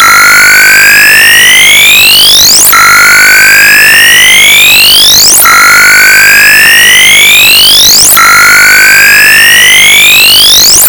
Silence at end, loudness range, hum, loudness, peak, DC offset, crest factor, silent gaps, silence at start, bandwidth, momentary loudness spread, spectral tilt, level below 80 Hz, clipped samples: 0 s; 0 LU; none; 2 LUFS; 0 dBFS; under 0.1%; 0 dB; none; 0 s; over 20 kHz; 1 LU; 1.5 dB/octave; -32 dBFS; 40%